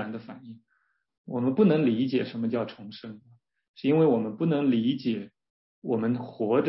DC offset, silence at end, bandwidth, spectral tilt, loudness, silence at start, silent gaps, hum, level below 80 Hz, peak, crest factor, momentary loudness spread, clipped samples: under 0.1%; 0 s; 5.8 kHz; -11.5 dB/octave; -26 LUFS; 0 s; 1.18-1.24 s, 3.68-3.74 s, 5.50-5.82 s; none; -72 dBFS; -10 dBFS; 18 dB; 20 LU; under 0.1%